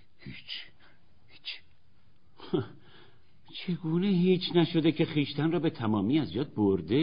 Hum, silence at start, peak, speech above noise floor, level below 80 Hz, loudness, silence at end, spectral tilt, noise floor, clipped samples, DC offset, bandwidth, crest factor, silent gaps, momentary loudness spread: none; 0.25 s; -12 dBFS; 39 dB; -64 dBFS; -29 LUFS; 0 s; -6 dB/octave; -66 dBFS; under 0.1%; 0.3%; 5.2 kHz; 18 dB; none; 17 LU